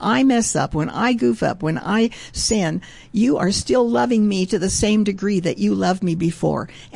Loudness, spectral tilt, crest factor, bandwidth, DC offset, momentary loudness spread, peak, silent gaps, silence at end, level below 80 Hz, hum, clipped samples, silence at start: -19 LUFS; -5 dB/octave; 12 dB; 11.5 kHz; 0.2%; 6 LU; -6 dBFS; none; 0.1 s; -42 dBFS; none; under 0.1%; 0 s